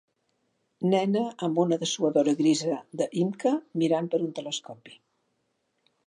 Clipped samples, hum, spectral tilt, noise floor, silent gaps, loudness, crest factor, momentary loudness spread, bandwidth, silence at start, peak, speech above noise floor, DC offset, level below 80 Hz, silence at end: under 0.1%; none; -5.5 dB/octave; -75 dBFS; none; -27 LUFS; 18 dB; 9 LU; 11 kHz; 0.8 s; -10 dBFS; 49 dB; under 0.1%; -80 dBFS; 1.15 s